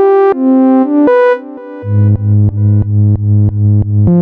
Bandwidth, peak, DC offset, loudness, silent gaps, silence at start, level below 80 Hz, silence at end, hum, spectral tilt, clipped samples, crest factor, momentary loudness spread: 3.6 kHz; 0 dBFS; under 0.1%; -10 LUFS; none; 0 s; -32 dBFS; 0 s; none; -12 dB/octave; under 0.1%; 8 dB; 5 LU